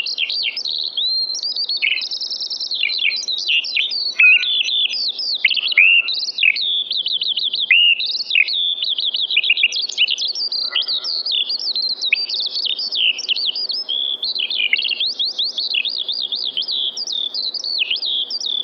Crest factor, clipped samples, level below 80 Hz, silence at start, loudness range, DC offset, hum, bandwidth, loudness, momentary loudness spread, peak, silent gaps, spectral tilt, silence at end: 18 dB; under 0.1%; under -90 dBFS; 0 s; 5 LU; under 0.1%; none; 7.6 kHz; -16 LUFS; 8 LU; -2 dBFS; none; 3 dB/octave; 0 s